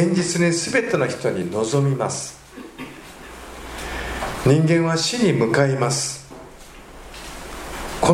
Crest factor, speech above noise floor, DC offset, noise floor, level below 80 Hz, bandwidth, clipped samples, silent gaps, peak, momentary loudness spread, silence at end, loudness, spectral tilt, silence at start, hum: 18 dB; 22 dB; under 0.1%; -41 dBFS; -42 dBFS; 16 kHz; under 0.1%; none; -2 dBFS; 21 LU; 0 s; -20 LUFS; -5 dB/octave; 0 s; none